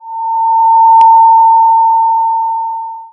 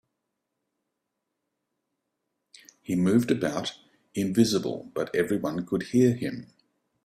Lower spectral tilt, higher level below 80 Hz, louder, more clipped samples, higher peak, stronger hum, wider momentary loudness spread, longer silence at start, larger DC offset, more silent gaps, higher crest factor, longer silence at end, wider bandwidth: second, -2 dB/octave vs -6 dB/octave; about the same, -66 dBFS vs -64 dBFS; first, -8 LUFS vs -26 LUFS; neither; first, 0 dBFS vs -8 dBFS; neither; about the same, 12 LU vs 12 LU; second, 0.05 s vs 2.9 s; neither; neither; second, 8 dB vs 20 dB; second, 0.05 s vs 0.6 s; second, 3.3 kHz vs 15 kHz